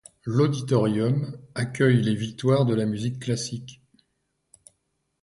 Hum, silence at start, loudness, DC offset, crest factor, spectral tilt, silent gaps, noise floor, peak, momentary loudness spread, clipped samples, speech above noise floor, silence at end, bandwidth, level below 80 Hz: none; 0.25 s; -24 LUFS; under 0.1%; 18 dB; -6.5 dB/octave; none; -75 dBFS; -8 dBFS; 11 LU; under 0.1%; 52 dB; 1.5 s; 11.5 kHz; -60 dBFS